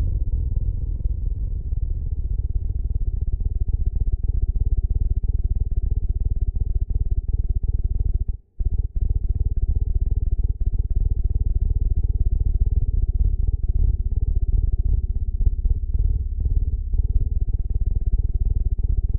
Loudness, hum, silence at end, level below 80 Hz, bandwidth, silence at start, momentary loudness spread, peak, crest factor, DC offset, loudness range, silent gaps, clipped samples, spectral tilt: -26 LUFS; none; 0 s; -22 dBFS; 0.9 kHz; 0 s; 4 LU; -6 dBFS; 14 dB; 0.1%; 3 LU; none; under 0.1%; -15.5 dB/octave